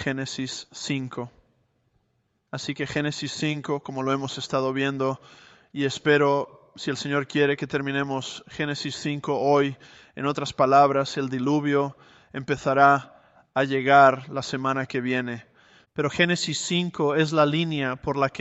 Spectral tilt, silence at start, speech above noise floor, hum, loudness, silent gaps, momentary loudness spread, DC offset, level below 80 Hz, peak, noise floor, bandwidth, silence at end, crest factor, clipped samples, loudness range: -5 dB/octave; 0 s; 48 dB; none; -24 LUFS; none; 15 LU; under 0.1%; -62 dBFS; -4 dBFS; -72 dBFS; 8.2 kHz; 0 s; 22 dB; under 0.1%; 8 LU